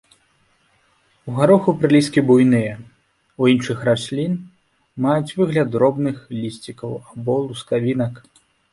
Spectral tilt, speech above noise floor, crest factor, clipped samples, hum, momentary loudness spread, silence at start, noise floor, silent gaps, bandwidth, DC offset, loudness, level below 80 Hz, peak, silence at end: -7 dB/octave; 43 dB; 18 dB; under 0.1%; none; 15 LU; 1.25 s; -61 dBFS; none; 11.5 kHz; under 0.1%; -19 LUFS; -58 dBFS; -2 dBFS; 0.55 s